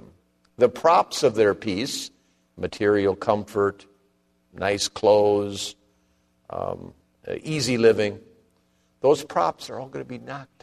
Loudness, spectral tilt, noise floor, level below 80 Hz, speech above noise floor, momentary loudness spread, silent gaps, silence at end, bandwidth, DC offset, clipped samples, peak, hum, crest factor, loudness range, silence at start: -23 LUFS; -4.5 dB/octave; -66 dBFS; -60 dBFS; 43 dB; 17 LU; none; 0.2 s; 13.5 kHz; under 0.1%; under 0.1%; -6 dBFS; 60 Hz at -60 dBFS; 18 dB; 4 LU; 0.6 s